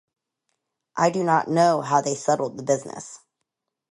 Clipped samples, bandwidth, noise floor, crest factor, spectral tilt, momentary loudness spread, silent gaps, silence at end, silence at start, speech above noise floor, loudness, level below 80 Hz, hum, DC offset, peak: under 0.1%; 11.5 kHz; -81 dBFS; 20 dB; -5 dB/octave; 17 LU; none; 0.75 s; 0.95 s; 59 dB; -22 LUFS; -72 dBFS; none; under 0.1%; -6 dBFS